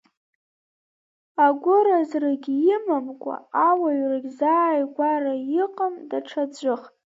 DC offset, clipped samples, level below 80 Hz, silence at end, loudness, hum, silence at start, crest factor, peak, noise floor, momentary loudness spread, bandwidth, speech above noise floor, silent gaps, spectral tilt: under 0.1%; under 0.1%; -82 dBFS; 0.25 s; -22 LUFS; none; 1.4 s; 18 dB; -6 dBFS; under -90 dBFS; 10 LU; 7.8 kHz; over 68 dB; none; -5.5 dB/octave